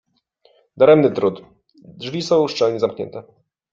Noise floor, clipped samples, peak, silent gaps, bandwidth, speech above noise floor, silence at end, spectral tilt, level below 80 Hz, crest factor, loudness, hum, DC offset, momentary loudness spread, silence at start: -59 dBFS; under 0.1%; -2 dBFS; none; 7.6 kHz; 42 dB; 0.5 s; -6 dB/octave; -62 dBFS; 18 dB; -17 LUFS; none; under 0.1%; 20 LU; 0.75 s